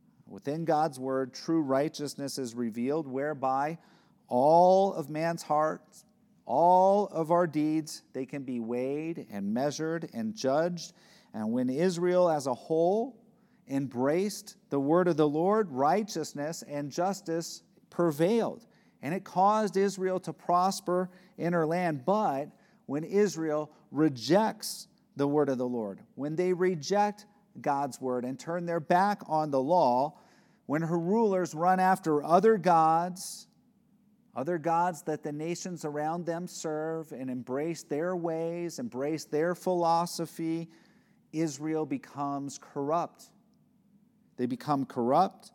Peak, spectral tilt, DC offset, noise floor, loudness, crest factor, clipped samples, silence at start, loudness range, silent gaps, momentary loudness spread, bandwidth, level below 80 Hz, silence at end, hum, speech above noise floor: -10 dBFS; -6 dB/octave; under 0.1%; -66 dBFS; -29 LUFS; 20 dB; under 0.1%; 0.3 s; 7 LU; none; 12 LU; 17.5 kHz; -86 dBFS; 0.05 s; none; 37 dB